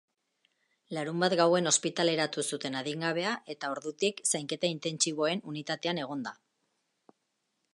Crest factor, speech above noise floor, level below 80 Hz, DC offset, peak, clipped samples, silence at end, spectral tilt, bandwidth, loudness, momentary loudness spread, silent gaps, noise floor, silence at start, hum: 22 dB; 49 dB; -82 dBFS; under 0.1%; -10 dBFS; under 0.1%; 1.4 s; -3 dB/octave; 11.5 kHz; -30 LUFS; 11 LU; none; -80 dBFS; 0.9 s; none